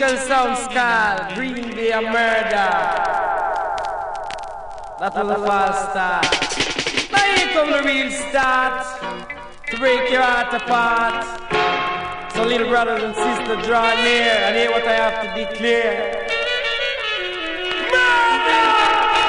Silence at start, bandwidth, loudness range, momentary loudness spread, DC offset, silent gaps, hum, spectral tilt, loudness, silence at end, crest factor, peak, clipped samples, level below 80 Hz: 0 s; 10.5 kHz; 3 LU; 11 LU; under 0.1%; none; none; -2.5 dB/octave; -18 LUFS; 0 s; 16 dB; -2 dBFS; under 0.1%; -46 dBFS